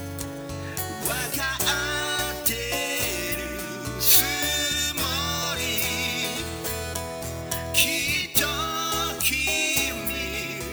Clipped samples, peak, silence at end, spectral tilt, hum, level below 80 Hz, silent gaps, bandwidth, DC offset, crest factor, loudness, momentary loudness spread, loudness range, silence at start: under 0.1%; -2 dBFS; 0 s; -2 dB/octave; none; -44 dBFS; none; over 20 kHz; under 0.1%; 24 dB; -24 LUFS; 10 LU; 3 LU; 0 s